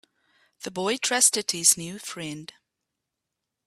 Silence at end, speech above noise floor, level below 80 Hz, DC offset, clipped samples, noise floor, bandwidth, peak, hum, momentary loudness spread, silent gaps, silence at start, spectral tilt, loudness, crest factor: 1.2 s; 58 dB; -72 dBFS; under 0.1%; under 0.1%; -84 dBFS; 15.5 kHz; -4 dBFS; none; 17 LU; none; 0.6 s; -1 dB/octave; -21 LUFS; 26 dB